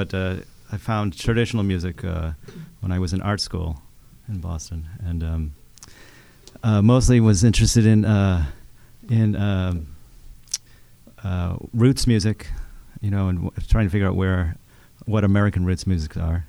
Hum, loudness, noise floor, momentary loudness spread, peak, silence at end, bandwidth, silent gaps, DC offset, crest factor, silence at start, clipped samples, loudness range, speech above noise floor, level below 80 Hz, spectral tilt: none; -22 LUFS; -48 dBFS; 16 LU; -4 dBFS; 0.05 s; 12.5 kHz; none; under 0.1%; 18 dB; 0 s; under 0.1%; 9 LU; 28 dB; -32 dBFS; -6 dB/octave